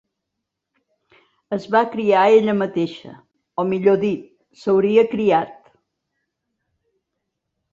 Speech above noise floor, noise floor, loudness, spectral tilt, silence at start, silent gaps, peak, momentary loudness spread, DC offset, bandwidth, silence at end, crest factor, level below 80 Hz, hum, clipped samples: 63 dB; -80 dBFS; -18 LUFS; -7.5 dB/octave; 1.5 s; none; -2 dBFS; 14 LU; under 0.1%; 7.4 kHz; 2.2 s; 18 dB; -64 dBFS; none; under 0.1%